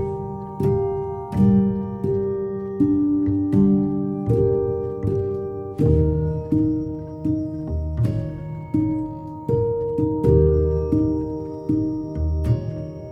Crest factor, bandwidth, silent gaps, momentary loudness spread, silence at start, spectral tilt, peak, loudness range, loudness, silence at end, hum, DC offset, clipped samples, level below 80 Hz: 16 dB; 6 kHz; none; 10 LU; 0 s; -11.5 dB/octave; -4 dBFS; 4 LU; -22 LUFS; 0 s; none; under 0.1%; under 0.1%; -32 dBFS